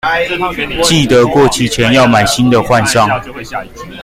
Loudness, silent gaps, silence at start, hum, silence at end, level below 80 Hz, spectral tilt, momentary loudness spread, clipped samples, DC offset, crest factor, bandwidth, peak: -10 LUFS; none; 0.05 s; none; 0 s; -34 dBFS; -4.5 dB/octave; 15 LU; under 0.1%; under 0.1%; 10 dB; 16.5 kHz; 0 dBFS